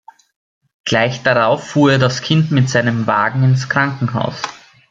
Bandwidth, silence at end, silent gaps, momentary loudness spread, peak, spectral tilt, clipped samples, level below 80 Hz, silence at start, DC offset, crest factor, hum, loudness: 7.6 kHz; 0.35 s; none; 7 LU; -2 dBFS; -6 dB/octave; under 0.1%; -54 dBFS; 0.85 s; under 0.1%; 14 dB; none; -15 LUFS